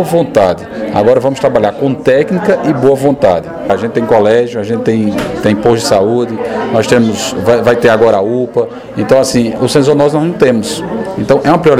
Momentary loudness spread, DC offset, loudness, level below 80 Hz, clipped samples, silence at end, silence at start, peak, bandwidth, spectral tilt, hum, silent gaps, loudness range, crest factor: 7 LU; 0.3%; -11 LUFS; -42 dBFS; 0.5%; 0 s; 0 s; 0 dBFS; 15.5 kHz; -5.5 dB/octave; none; none; 1 LU; 10 dB